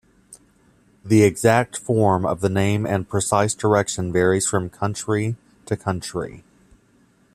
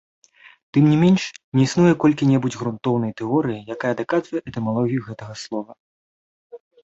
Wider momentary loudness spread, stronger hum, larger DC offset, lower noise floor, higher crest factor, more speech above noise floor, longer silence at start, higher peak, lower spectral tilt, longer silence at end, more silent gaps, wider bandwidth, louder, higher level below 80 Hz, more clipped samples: second, 11 LU vs 14 LU; neither; neither; second, -58 dBFS vs under -90 dBFS; about the same, 18 dB vs 16 dB; second, 38 dB vs over 70 dB; second, 0.3 s vs 0.75 s; about the same, -2 dBFS vs -4 dBFS; second, -5.5 dB/octave vs -7 dB/octave; first, 0.95 s vs 0.25 s; second, none vs 1.44-1.52 s, 5.80-6.50 s; first, 14.5 kHz vs 8 kHz; about the same, -21 LUFS vs -20 LUFS; about the same, -54 dBFS vs -58 dBFS; neither